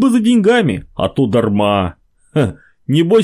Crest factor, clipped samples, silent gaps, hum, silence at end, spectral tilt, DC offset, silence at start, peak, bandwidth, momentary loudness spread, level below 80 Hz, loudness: 12 dB; under 0.1%; none; none; 0 s; -7 dB/octave; under 0.1%; 0 s; -2 dBFS; 15 kHz; 9 LU; -40 dBFS; -15 LUFS